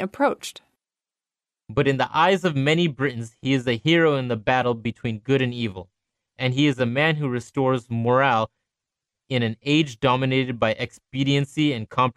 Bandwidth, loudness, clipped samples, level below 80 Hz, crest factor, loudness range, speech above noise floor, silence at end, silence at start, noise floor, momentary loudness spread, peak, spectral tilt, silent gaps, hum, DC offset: 13 kHz; -22 LUFS; under 0.1%; -56 dBFS; 18 dB; 2 LU; over 68 dB; 0.05 s; 0 s; under -90 dBFS; 10 LU; -6 dBFS; -6 dB/octave; none; none; under 0.1%